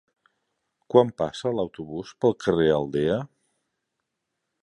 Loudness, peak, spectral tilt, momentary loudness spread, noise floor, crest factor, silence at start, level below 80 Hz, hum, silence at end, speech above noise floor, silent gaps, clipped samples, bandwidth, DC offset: -24 LUFS; -2 dBFS; -7 dB/octave; 12 LU; -81 dBFS; 24 dB; 0.95 s; -56 dBFS; none; 1.35 s; 58 dB; none; under 0.1%; 10.5 kHz; under 0.1%